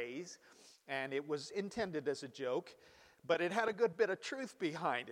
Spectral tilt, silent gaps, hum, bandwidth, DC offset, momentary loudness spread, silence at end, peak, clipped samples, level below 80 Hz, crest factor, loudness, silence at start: -4.5 dB/octave; none; none; 14.5 kHz; under 0.1%; 16 LU; 0 s; -18 dBFS; under 0.1%; -80 dBFS; 20 dB; -39 LUFS; 0 s